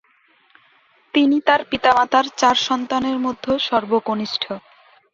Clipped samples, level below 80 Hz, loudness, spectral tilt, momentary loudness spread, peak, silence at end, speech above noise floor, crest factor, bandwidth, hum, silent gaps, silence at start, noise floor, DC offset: under 0.1%; -56 dBFS; -19 LUFS; -3.5 dB/octave; 7 LU; -2 dBFS; 0.55 s; 39 dB; 18 dB; 7.6 kHz; none; none; 1.15 s; -58 dBFS; under 0.1%